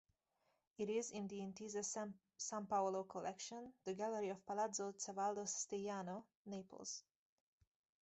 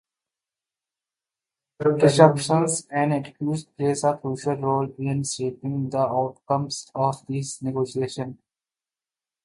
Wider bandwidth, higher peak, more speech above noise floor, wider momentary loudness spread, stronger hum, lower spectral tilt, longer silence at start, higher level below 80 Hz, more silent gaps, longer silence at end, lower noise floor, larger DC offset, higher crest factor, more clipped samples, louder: second, 8.2 kHz vs 11.5 kHz; second, -28 dBFS vs 0 dBFS; second, 39 dB vs over 67 dB; about the same, 10 LU vs 11 LU; neither; second, -3.5 dB/octave vs -5.5 dB/octave; second, 0.8 s vs 1.8 s; second, -86 dBFS vs -66 dBFS; first, 6.35-6.45 s vs none; about the same, 1 s vs 1.1 s; second, -85 dBFS vs under -90 dBFS; neither; second, 18 dB vs 24 dB; neither; second, -46 LUFS vs -24 LUFS